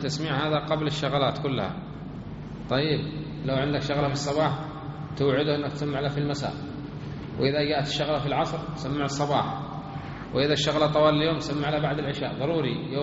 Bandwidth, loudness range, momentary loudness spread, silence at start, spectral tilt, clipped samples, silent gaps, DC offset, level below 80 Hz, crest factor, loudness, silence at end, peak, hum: 8 kHz; 3 LU; 13 LU; 0 s; -4.5 dB/octave; under 0.1%; none; under 0.1%; -50 dBFS; 18 dB; -27 LUFS; 0 s; -8 dBFS; none